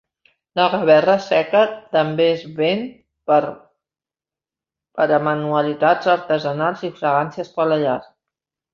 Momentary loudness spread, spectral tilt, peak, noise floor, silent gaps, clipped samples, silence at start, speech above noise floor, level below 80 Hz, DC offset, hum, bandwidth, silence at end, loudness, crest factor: 11 LU; -6.5 dB/octave; -2 dBFS; under -90 dBFS; none; under 0.1%; 0.55 s; over 72 dB; -64 dBFS; under 0.1%; none; 7 kHz; 0.7 s; -18 LUFS; 18 dB